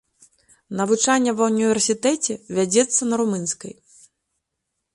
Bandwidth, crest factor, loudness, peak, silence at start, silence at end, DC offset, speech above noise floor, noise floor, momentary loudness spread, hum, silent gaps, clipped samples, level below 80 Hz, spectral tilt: 11.5 kHz; 18 dB; -20 LUFS; -4 dBFS; 0.7 s; 1.2 s; under 0.1%; 58 dB; -79 dBFS; 9 LU; none; none; under 0.1%; -66 dBFS; -3.5 dB/octave